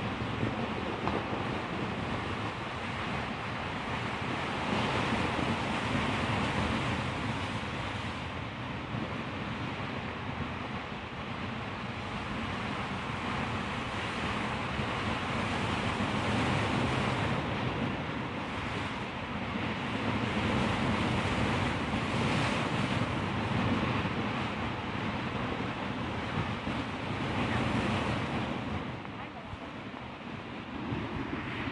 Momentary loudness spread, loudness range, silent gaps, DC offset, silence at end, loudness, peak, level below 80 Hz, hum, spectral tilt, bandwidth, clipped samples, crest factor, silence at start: 7 LU; 6 LU; none; under 0.1%; 0 s; -33 LUFS; -14 dBFS; -50 dBFS; none; -6 dB/octave; 11.5 kHz; under 0.1%; 20 dB; 0 s